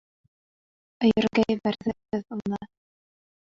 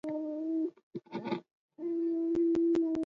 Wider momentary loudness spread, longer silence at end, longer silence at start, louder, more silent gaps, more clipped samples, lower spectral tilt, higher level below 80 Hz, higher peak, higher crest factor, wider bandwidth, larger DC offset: second, 10 LU vs 13 LU; first, 0.85 s vs 0 s; first, 1 s vs 0.05 s; first, -26 LUFS vs -33 LUFS; second, none vs 0.83-0.91 s, 1.51-1.69 s; neither; about the same, -7 dB/octave vs -8 dB/octave; first, -58 dBFS vs -68 dBFS; first, -10 dBFS vs -22 dBFS; first, 18 dB vs 10 dB; about the same, 7.4 kHz vs 6.8 kHz; neither